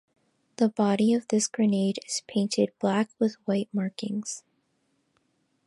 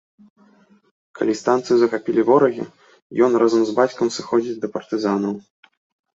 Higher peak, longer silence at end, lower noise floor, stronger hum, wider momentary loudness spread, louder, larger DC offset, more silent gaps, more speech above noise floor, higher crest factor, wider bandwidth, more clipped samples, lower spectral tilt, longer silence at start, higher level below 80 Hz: second, -10 dBFS vs -2 dBFS; first, 1.3 s vs 0.75 s; first, -73 dBFS vs -54 dBFS; neither; second, 8 LU vs 12 LU; second, -27 LUFS vs -19 LUFS; neither; second, none vs 3.02-3.10 s; first, 47 dB vs 36 dB; about the same, 18 dB vs 18 dB; first, 11.5 kHz vs 7.8 kHz; neither; about the same, -5 dB/octave vs -5.5 dB/octave; second, 0.6 s vs 1.15 s; second, -76 dBFS vs -66 dBFS